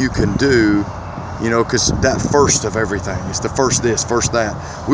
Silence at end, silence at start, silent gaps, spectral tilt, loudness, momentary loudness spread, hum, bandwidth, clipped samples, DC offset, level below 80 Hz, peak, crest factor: 0 s; 0 s; none; -4 dB/octave; -16 LUFS; 10 LU; none; 8 kHz; under 0.1%; under 0.1%; -32 dBFS; 0 dBFS; 16 dB